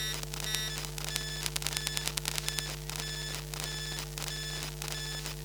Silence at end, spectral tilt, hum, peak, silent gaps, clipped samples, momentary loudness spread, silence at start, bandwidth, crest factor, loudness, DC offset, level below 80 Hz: 0 s; -2 dB/octave; none; -6 dBFS; none; under 0.1%; 4 LU; 0 s; 19 kHz; 30 dB; -34 LUFS; under 0.1%; -46 dBFS